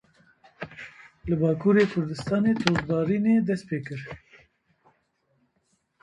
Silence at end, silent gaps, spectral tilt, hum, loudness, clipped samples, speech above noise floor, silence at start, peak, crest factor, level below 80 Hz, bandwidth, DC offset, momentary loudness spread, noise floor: 1.85 s; none; -7 dB/octave; none; -24 LUFS; under 0.1%; 48 dB; 0.6 s; 0 dBFS; 26 dB; -56 dBFS; 10 kHz; under 0.1%; 20 LU; -72 dBFS